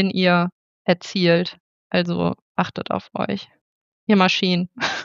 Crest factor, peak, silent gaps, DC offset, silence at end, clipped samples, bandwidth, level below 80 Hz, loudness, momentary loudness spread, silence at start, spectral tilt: 20 dB; -2 dBFS; 0.52-0.85 s, 1.60-1.90 s, 2.42-2.55 s, 3.61-4.07 s; under 0.1%; 0 s; under 0.1%; 7.6 kHz; -62 dBFS; -21 LUFS; 10 LU; 0 s; -6 dB/octave